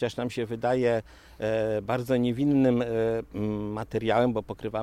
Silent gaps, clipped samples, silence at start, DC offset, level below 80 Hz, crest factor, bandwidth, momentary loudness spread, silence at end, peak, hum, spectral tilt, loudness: none; under 0.1%; 0 s; under 0.1%; -54 dBFS; 16 dB; 14 kHz; 8 LU; 0 s; -12 dBFS; none; -7.5 dB/octave; -27 LUFS